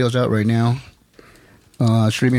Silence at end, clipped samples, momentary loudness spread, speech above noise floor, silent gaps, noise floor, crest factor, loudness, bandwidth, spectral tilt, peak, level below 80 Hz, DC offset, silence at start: 0 s; under 0.1%; 5 LU; 33 dB; none; -50 dBFS; 12 dB; -19 LUFS; 13 kHz; -7 dB/octave; -6 dBFS; -54 dBFS; under 0.1%; 0 s